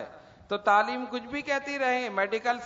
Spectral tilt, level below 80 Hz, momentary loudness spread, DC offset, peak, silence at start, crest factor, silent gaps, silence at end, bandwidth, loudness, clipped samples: -3.5 dB/octave; -66 dBFS; 10 LU; under 0.1%; -10 dBFS; 0 s; 18 dB; none; 0 s; 7.8 kHz; -28 LUFS; under 0.1%